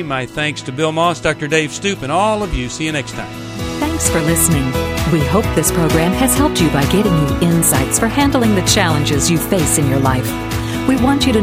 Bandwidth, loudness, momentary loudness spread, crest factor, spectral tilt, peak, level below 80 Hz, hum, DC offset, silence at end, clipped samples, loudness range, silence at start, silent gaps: 16 kHz; -15 LUFS; 7 LU; 14 dB; -4.5 dB/octave; 0 dBFS; -30 dBFS; none; under 0.1%; 0 s; under 0.1%; 4 LU; 0 s; none